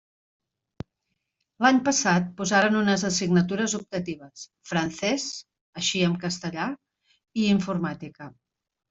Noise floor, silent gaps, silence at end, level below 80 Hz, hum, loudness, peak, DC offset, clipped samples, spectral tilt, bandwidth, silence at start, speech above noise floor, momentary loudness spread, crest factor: -80 dBFS; 5.61-5.73 s; 0.6 s; -62 dBFS; none; -25 LUFS; -6 dBFS; under 0.1%; under 0.1%; -4 dB/octave; 8 kHz; 1.6 s; 55 dB; 22 LU; 20 dB